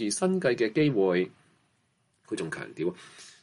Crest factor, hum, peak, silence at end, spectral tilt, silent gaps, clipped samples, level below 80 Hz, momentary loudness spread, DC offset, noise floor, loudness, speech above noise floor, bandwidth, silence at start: 16 dB; none; -12 dBFS; 0.1 s; -5 dB/octave; none; under 0.1%; -72 dBFS; 13 LU; under 0.1%; -71 dBFS; -28 LUFS; 44 dB; 11.5 kHz; 0 s